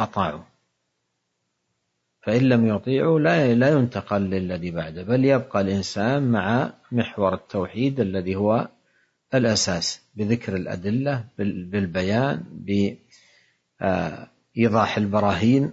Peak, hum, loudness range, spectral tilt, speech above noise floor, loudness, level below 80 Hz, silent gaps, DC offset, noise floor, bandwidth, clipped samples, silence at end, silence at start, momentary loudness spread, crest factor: -6 dBFS; none; 5 LU; -6 dB/octave; 54 dB; -23 LUFS; -60 dBFS; none; under 0.1%; -76 dBFS; 8 kHz; under 0.1%; 0 s; 0 s; 10 LU; 18 dB